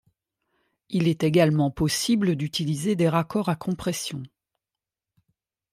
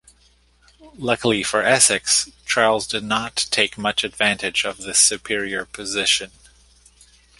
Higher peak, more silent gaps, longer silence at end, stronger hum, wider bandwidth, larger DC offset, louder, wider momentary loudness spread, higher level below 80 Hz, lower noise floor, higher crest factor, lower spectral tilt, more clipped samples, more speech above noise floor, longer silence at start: second, -8 dBFS vs 0 dBFS; neither; first, 1.45 s vs 1.1 s; neither; first, 16 kHz vs 12 kHz; neither; second, -24 LUFS vs -19 LUFS; about the same, 9 LU vs 10 LU; about the same, -54 dBFS vs -54 dBFS; first, -89 dBFS vs -57 dBFS; about the same, 18 dB vs 22 dB; first, -5.5 dB/octave vs -1 dB/octave; neither; first, 66 dB vs 36 dB; about the same, 0.9 s vs 0.85 s